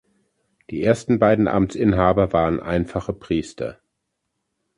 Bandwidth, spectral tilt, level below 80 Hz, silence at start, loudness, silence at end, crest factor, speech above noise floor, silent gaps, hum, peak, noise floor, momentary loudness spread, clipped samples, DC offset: 11 kHz; -7.5 dB/octave; -40 dBFS; 0.7 s; -20 LUFS; 1.05 s; 20 dB; 57 dB; none; none; -2 dBFS; -77 dBFS; 13 LU; under 0.1%; under 0.1%